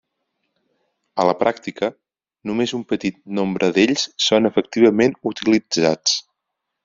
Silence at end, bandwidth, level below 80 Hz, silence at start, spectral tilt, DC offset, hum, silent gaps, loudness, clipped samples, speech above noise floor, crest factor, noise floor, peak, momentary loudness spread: 0.65 s; 7.6 kHz; -60 dBFS; 1.15 s; -3.5 dB/octave; under 0.1%; none; none; -19 LUFS; under 0.1%; 61 dB; 18 dB; -79 dBFS; -2 dBFS; 9 LU